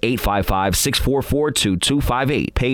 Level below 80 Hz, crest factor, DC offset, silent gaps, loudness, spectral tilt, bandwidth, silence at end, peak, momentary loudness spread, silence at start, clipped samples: -28 dBFS; 14 dB; under 0.1%; none; -18 LUFS; -4 dB/octave; 19 kHz; 0 s; -4 dBFS; 3 LU; 0.05 s; under 0.1%